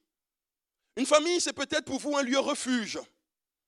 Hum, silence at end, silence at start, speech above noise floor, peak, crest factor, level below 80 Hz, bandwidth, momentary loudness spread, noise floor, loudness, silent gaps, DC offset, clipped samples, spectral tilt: none; 0.65 s; 0.95 s; over 62 dB; -8 dBFS; 24 dB; -74 dBFS; 12.5 kHz; 12 LU; under -90 dBFS; -28 LUFS; none; under 0.1%; under 0.1%; -2 dB/octave